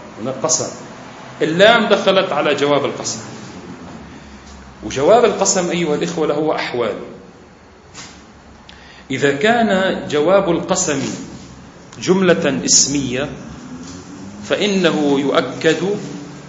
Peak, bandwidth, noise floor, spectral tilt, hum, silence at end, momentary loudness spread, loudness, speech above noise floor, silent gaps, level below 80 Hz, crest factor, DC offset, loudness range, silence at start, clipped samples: 0 dBFS; 8.2 kHz; -43 dBFS; -3.5 dB/octave; none; 0 s; 22 LU; -16 LUFS; 27 dB; none; -50 dBFS; 18 dB; under 0.1%; 5 LU; 0 s; under 0.1%